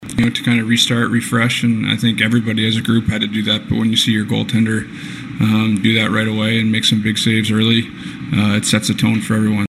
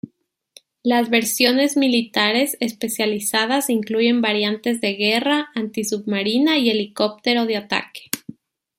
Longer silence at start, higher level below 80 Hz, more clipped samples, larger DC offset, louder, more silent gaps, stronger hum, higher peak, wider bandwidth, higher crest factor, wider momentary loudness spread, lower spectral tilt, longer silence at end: second, 0 s vs 0.85 s; first, -46 dBFS vs -68 dBFS; neither; neither; first, -15 LUFS vs -19 LUFS; neither; neither; about the same, 0 dBFS vs -2 dBFS; second, 14 kHz vs 16 kHz; about the same, 14 dB vs 18 dB; second, 4 LU vs 8 LU; first, -4.5 dB/octave vs -3 dB/octave; second, 0 s vs 0.45 s